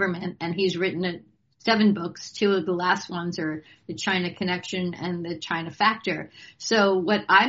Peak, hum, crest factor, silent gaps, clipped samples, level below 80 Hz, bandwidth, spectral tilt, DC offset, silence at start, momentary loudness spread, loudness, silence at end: -4 dBFS; none; 22 dB; none; under 0.1%; -68 dBFS; 7.6 kHz; -3 dB/octave; under 0.1%; 0 s; 11 LU; -25 LUFS; 0 s